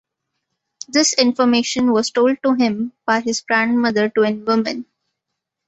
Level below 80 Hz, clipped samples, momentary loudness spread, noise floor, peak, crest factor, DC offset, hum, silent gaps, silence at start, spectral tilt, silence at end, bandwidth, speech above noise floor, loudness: -62 dBFS; under 0.1%; 5 LU; -80 dBFS; 0 dBFS; 18 dB; under 0.1%; none; none; 0.95 s; -3 dB/octave; 0.85 s; 8.2 kHz; 63 dB; -17 LUFS